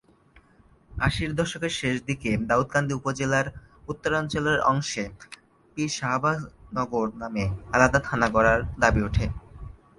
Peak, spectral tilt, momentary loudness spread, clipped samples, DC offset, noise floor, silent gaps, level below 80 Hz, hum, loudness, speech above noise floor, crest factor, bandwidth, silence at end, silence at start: -2 dBFS; -5 dB/octave; 16 LU; under 0.1%; under 0.1%; -58 dBFS; none; -40 dBFS; none; -25 LUFS; 33 dB; 24 dB; 11.5 kHz; 0.25 s; 0.9 s